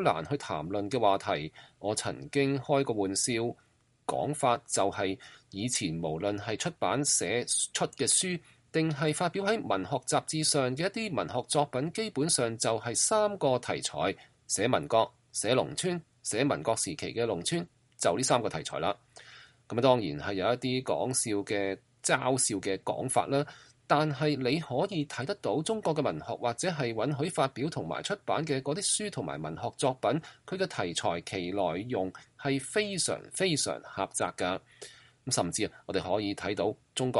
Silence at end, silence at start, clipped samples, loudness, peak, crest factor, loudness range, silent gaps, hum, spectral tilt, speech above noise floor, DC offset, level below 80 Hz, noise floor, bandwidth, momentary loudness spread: 0 s; 0 s; under 0.1%; -30 LUFS; -10 dBFS; 22 dB; 3 LU; none; none; -3.5 dB/octave; 24 dB; under 0.1%; -66 dBFS; -55 dBFS; 11.5 kHz; 8 LU